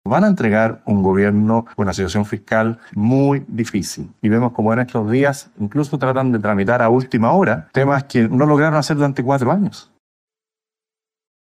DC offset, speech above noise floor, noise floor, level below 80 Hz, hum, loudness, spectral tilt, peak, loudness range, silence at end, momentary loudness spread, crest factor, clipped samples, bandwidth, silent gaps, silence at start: under 0.1%; over 74 dB; under -90 dBFS; -50 dBFS; none; -17 LUFS; -7 dB/octave; -4 dBFS; 3 LU; 1.75 s; 7 LU; 14 dB; under 0.1%; 13.5 kHz; none; 0.05 s